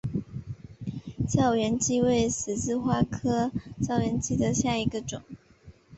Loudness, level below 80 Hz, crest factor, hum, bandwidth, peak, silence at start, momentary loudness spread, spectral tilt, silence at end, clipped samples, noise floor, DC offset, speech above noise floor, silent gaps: -27 LUFS; -48 dBFS; 18 dB; none; 8.4 kHz; -10 dBFS; 0.05 s; 14 LU; -5.5 dB/octave; 0 s; under 0.1%; -53 dBFS; under 0.1%; 27 dB; none